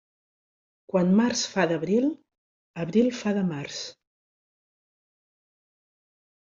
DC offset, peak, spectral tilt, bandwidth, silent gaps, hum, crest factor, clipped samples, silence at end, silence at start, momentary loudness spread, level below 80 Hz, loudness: under 0.1%; -8 dBFS; -5.5 dB/octave; 7.6 kHz; 2.38-2.74 s; none; 20 dB; under 0.1%; 2.55 s; 0.95 s; 14 LU; -68 dBFS; -25 LUFS